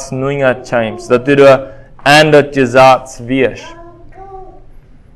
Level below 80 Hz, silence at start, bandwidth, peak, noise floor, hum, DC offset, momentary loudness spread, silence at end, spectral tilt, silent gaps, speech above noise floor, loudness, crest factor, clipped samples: -40 dBFS; 0 s; 16 kHz; 0 dBFS; -37 dBFS; none; under 0.1%; 10 LU; 0.7 s; -5 dB/octave; none; 27 dB; -10 LUFS; 12 dB; 1%